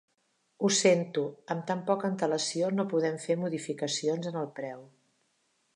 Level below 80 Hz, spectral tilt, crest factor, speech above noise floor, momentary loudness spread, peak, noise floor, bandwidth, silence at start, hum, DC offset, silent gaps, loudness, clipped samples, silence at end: -82 dBFS; -4 dB/octave; 20 dB; 45 dB; 11 LU; -12 dBFS; -74 dBFS; 11.5 kHz; 0.6 s; none; under 0.1%; none; -30 LUFS; under 0.1%; 0.9 s